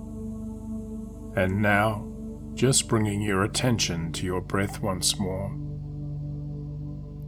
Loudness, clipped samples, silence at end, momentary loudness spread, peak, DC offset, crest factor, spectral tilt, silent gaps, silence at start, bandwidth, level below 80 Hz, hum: -27 LUFS; under 0.1%; 0 s; 14 LU; -8 dBFS; under 0.1%; 18 dB; -4 dB/octave; none; 0 s; 18 kHz; -42 dBFS; 50 Hz at -50 dBFS